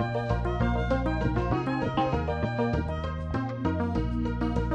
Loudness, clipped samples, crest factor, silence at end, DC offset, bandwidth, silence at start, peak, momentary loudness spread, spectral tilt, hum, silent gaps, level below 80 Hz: -29 LUFS; under 0.1%; 14 dB; 0 s; under 0.1%; 8 kHz; 0 s; -14 dBFS; 4 LU; -8.5 dB/octave; none; none; -34 dBFS